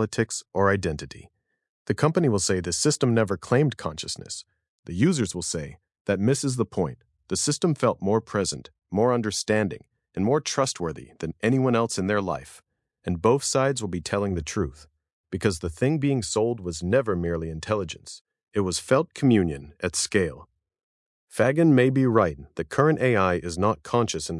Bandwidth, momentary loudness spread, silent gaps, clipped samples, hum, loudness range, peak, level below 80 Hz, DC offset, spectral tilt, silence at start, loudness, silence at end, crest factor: 12 kHz; 12 LU; 1.69-1.86 s, 4.69-4.83 s, 6.01-6.05 s, 15.13-15.24 s, 18.21-18.25 s, 18.43-18.47 s, 20.83-21.28 s; under 0.1%; none; 4 LU; -4 dBFS; -54 dBFS; under 0.1%; -5 dB/octave; 0 s; -25 LUFS; 0 s; 20 dB